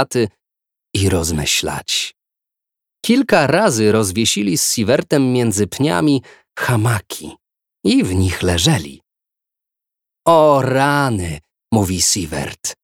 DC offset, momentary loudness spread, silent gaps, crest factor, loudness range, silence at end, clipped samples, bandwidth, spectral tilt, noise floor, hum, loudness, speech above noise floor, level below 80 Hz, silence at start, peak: under 0.1%; 11 LU; none; 18 dB; 4 LU; 0.1 s; under 0.1%; 17 kHz; -4.5 dB/octave; -84 dBFS; none; -16 LUFS; 68 dB; -42 dBFS; 0 s; 0 dBFS